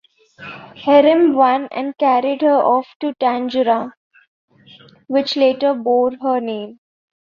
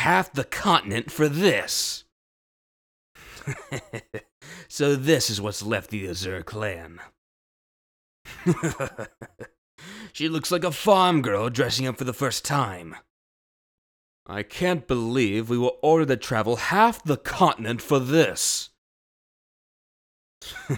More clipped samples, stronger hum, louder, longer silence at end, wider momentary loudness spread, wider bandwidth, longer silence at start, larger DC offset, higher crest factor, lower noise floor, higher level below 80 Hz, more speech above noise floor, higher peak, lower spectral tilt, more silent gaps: neither; neither; first, -16 LUFS vs -24 LUFS; first, 0.65 s vs 0 s; about the same, 17 LU vs 19 LU; second, 7 kHz vs over 20 kHz; first, 0.4 s vs 0 s; neither; second, 16 dB vs 22 dB; second, -46 dBFS vs under -90 dBFS; second, -66 dBFS vs -54 dBFS; second, 31 dB vs over 66 dB; about the same, -2 dBFS vs -4 dBFS; first, -6 dB/octave vs -4.5 dB/octave; second, 2.96-3.00 s, 3.97-4.11 s, 4.28-4.48 s vs 2.12-3.15 s, 4.32-4.41 s, 7.18-8.25 s, 9.58-9.78 s, 13.10-14.26 s, 18.78-20.41 s